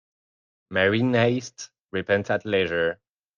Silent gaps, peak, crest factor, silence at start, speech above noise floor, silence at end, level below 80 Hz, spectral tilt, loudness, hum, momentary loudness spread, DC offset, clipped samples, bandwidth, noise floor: 1.80-1.85 s; -8 dBFS; 18 dB; 0.7 s; over 67 dB; 0.45 s; -64 dBFS; -5.5 dB/octave; -24 LUFS; none; 15 LU; under 0.1%; under 0.1%; 7.4 kHz; under -90 dBFS